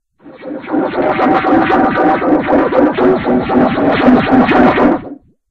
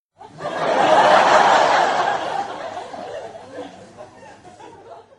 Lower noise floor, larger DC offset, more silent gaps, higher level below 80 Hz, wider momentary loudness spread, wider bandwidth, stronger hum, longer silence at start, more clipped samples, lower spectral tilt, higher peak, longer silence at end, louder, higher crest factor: second, -32 dBFS vs -43 dBFS; neither; neither; first, -38 dBFS vs -62 dBFS; second, 10 LU vs 23 LU; second, 5.8 kHz vs 11.5 kHz; neither; about the same, 0.25 s vs 0.2 s; neither; first, -8.5 dB/octave vs -3 dB/octave; about the same, 0 dBFS vs -2 dBFS; first, 0.35 s vs 0.2 s; first, -11 LUFS vs -16 LUFS; second, 12 dB vs 18 dB